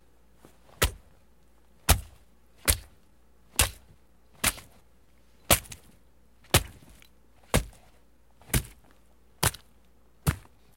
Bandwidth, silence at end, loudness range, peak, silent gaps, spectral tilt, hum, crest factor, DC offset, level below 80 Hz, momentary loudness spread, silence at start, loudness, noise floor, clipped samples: 16.5 kHz; 0.4 s; 4 LU; -2 dBFS; none; -2.5 dB/octave; none; 32 dB; 0.1%; -40 dBFS; 22 LU; 0.8 s; -28 LUFS; -62 dBFS; under 0.1%